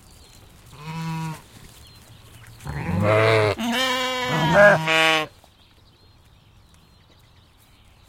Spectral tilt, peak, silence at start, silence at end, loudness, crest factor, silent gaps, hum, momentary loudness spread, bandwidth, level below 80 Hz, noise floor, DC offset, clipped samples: -4.5 dB/octave; -2 dBFS; 0.75 s; 2.8 s; -19 LUFS; 22 dB; none; none; 20 LU; 16.5 kHz; -52 dBFS; -54 dBFS; under 0.1%; under 0.1%